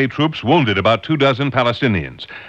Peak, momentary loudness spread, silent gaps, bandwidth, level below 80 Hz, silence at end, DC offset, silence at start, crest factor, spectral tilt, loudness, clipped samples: -2 dBFS; 4 LU; none; 8.2 kHz; -46 dBFS; 0 s; under 0.1%; 0 s; 14 dB; -7 dB/octave; -16 LUFS; under 0.1%